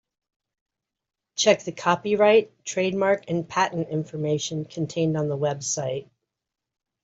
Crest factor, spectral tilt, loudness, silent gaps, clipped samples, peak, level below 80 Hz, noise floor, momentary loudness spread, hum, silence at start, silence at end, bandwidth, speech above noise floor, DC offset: 22 dB; -4.5 dB/octave; -24 LUFS; none; under 0.1%; -4 dBFS; -68 dBFS; -86 dBFS; 11 LU; none; 1.35 s; 1 s; 8 kHz; 62 dB; under 0.1%